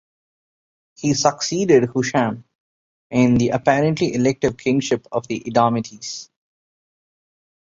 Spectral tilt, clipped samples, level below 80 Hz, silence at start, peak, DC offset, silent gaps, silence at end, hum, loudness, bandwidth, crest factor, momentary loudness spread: -5 dB/octave; under 0.1%; -52 dBFS; 1 s; -2 dBFS; under 0.1%; 2.55-3.10 s; 1.55 s; none; -19 LUFS; 7.8 kHz; 18 dB; 10 LU